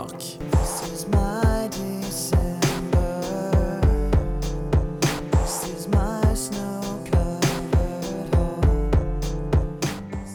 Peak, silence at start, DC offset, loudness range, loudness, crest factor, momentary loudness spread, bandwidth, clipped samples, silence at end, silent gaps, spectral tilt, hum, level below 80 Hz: -8 dBFS; 0 s; under 0.1%; 1 LU; -24 LUFS; 14 dB; 7 LU; over 20 kHz; under 0.1%; 0 s; none; -6 dB/octave; none; -26 dBFS